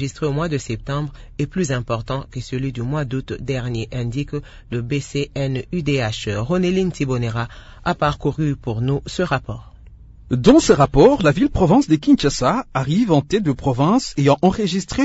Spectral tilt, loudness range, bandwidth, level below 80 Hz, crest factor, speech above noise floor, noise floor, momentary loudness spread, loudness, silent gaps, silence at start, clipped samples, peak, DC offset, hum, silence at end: -6.5 dB/octave; 9 LU; 8 kHz; -36 dBFS; 18 dB; 23 dB; -42 dBFS; 13 LU; -19 LUFS; none; 0 s; under 0.1%; -2 dBFS; under 0.1%; none; 0 s